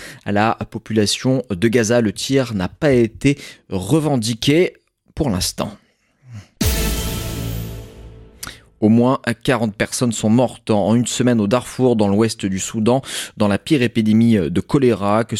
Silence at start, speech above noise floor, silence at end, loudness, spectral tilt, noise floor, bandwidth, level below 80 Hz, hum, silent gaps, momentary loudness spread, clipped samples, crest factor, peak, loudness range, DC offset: 0 s; 30 dB; 0 s; -18 LUFS; -5.5 dB/octave; -47 dBFS; 17 kHz; -36 dBFS; none; none; 11 LU; under 0.1%; 16 dB; -2 dBFS; 6 LU; under 0.1%